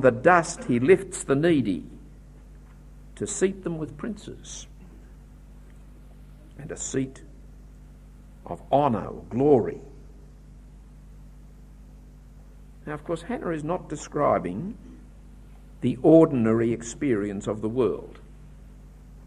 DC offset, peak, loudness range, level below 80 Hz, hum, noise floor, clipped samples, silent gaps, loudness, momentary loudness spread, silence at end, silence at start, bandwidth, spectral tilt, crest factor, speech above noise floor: under 0.1%; -4 dBFS; 14 LU; -48 dBFS; 50 Hz at -45 dBFS; -47 dBFS; under 0.1%; none; -24 LUFS; 20 LU; 0 s; 0 s; 12 kHz; -6 dB/octave; 22 dB; 23 dB